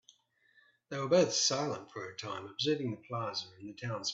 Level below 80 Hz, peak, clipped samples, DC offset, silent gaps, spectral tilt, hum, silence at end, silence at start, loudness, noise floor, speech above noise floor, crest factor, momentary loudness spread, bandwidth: -76 dBFS; -16 dBFS; under 0.1%; under 0.1%; none; -3.5 dB/octave; none; 0 s; 0.9 s; -34 LUFS; -69 dBFS; 35 dB; 20 dB; 15 LU; 8.4 kHz